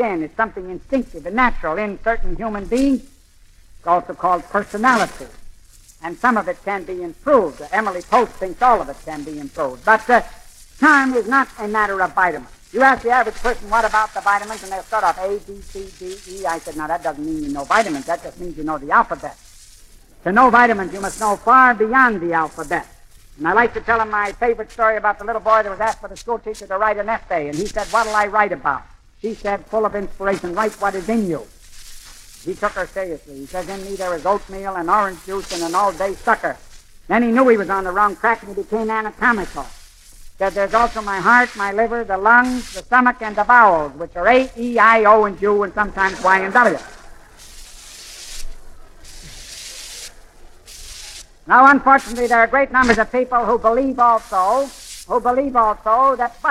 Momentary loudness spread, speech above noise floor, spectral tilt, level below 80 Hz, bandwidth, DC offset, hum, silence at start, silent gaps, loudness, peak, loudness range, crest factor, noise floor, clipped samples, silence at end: 17 LU; 30 dB; -4.5 dB/octave; -38 dBFS; 15.5 kHz; under 0.1%; none; 0 s; none; -17 LUFS; 0 dBFS; 9 LU; 18 dB; -48 dBFS; under 0.1%; 0 s